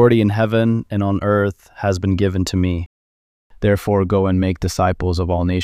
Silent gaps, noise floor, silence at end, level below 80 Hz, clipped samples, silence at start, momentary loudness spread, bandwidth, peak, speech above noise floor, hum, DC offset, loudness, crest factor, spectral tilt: 2.86-3.50 s; under -90 dBFS; 0 s; -36 dBFS; under 0.1%; 0 s; 5 LU; 15 kHz; -2 dBFS; over 73 dB; none; under 0.1%; -18 LUFS; 16 dB; -7 dB/octave